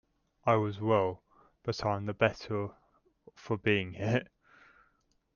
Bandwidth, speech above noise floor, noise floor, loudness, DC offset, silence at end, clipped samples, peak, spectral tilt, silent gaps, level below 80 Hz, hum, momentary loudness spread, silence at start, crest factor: 7 kHz; 42 dB; -73 dBFS; -32 LUFS; under 0.1%; 1.1 s; under 0.1%; -10 dBFS; -7 dB/octave; none; -64 dBFS; none; 9 LU; 0.45 s; 24 dB